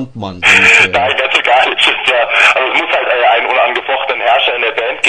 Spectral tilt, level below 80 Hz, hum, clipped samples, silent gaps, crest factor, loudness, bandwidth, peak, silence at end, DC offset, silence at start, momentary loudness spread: -2 dB/octave; -50 dBFS; none; 0.3%; none; 12 dB; -9 LUFS; 12 kHz; 0 dBFS; 0 s; under 0.1%; 0 s; 8 LU